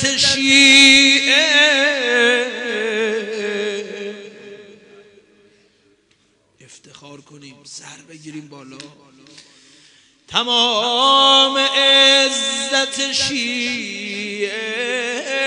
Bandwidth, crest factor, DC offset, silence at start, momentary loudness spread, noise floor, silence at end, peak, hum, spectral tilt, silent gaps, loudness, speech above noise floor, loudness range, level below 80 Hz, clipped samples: 11.5 kHz; 18 dB; under 0.1%; 0 s; 21 LU; -60 dBFS; 0 s; 0 dBFS; none; -1 dB/octave; none; -13 LUFS; 42 dB; 17 LU; -60 dBFS; under 0.1%